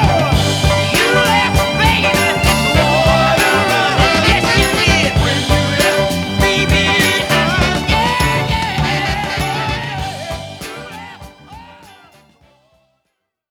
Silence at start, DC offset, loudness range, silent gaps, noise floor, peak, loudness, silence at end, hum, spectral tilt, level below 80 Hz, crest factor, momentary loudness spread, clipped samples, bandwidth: 0 s; under 0.1%; 12 LU; none; -71 dBFS; 0 dBFS; -13 LUFS; 1.8 s; none; -4 dB/octave; -26 dBFS; 14 dB; 12 LU; under 0.1%; over 20 kHz